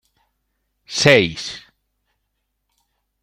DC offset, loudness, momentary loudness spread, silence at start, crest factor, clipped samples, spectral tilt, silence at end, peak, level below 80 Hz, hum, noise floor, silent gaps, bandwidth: under 0.1%; -16 LUFS; 18 LU; 0.9 s; 22 dB; under 0.1%; -4 dB/octave; 1.65 s; 0 dBFS; -56 dBFS; none; -74 dBFS; none; 16 kHz